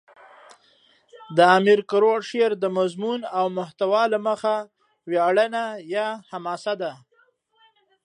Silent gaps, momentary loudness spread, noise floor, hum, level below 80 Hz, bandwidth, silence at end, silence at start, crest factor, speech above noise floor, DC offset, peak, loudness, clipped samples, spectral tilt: none; 12 LU; -63 dBFS; none; -80 dBFS; 10.5 kHz; 1.1 s; 1.15 s; 20 dB; 42 dB; under 0.1%; -4 dBFS; -22 LUFS; under 0.1%; -5.5 dB/octave